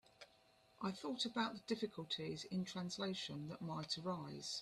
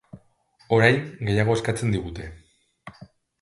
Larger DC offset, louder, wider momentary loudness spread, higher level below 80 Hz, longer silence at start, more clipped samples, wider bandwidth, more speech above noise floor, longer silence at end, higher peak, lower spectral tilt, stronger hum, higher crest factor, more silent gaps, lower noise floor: neither; second, -44 LUFS vs -22 LUFS; second, 6 LU vs 23 LU; second, -80 dBFS vs -48 dBFS; about the same, 0.2 s vs 0.15 s; neither; first, 13 kHz vs 11.5 kHz; second, 27 dB vs 38 dB; second, 0 s vs 0.35 s; second, -26 dBFS vs 0 dBFS; second, -4.5 dB/octave vs -6 dB/octave; neither; about the same, 20 dB vs 24 dB; neither; first, -72 dBFS vs -61 dBFS